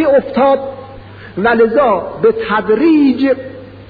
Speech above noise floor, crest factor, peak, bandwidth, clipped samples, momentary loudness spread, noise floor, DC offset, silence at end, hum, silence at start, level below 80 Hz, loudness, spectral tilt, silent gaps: 21 dB; 12 dB; -2 dBFS; 5 kHz; under 0.1%; 17 LU; -33 dBFS; 0.1%; 0.05 s; none; 0 s; -44 dBFS; -12 LUFS; -9 dB/octave; none